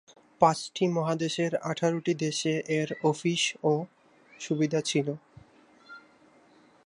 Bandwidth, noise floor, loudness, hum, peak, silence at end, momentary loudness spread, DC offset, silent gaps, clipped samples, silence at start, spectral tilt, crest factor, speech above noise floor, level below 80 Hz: 11 kHz; -59 dBFS; -28 LUFS; none; -6 dBFS; 0.85 s; 7 LU; under 0.1%; none; under 0.1%; 0.4 s; -5 dB/octave; 24 dB; 32 dB; -72 dBFS